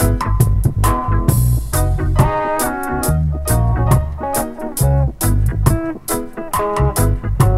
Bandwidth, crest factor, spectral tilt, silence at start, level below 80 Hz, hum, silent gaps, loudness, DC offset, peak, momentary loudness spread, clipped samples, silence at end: 16.5 kHz; 16 dB; -6 dB/octave; 0 s; -20 dBFS; none; none; -17 LUFS; under 0.1%; 0 dBFS; 5 LU; under 0.1%; 0 s